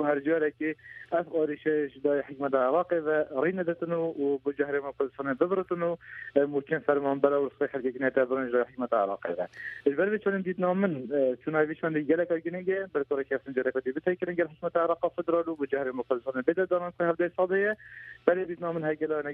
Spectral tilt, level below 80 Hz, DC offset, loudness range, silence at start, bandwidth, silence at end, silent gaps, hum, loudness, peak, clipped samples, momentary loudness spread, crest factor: -9.5 dB/octave; -70 dBFS; under 0.1%; 1 LU; 0 s; 4.4 kHz; 0 s; none; none; -29 LUFS; -8 dBFS; under 0.1%; 5 LU; 20 dB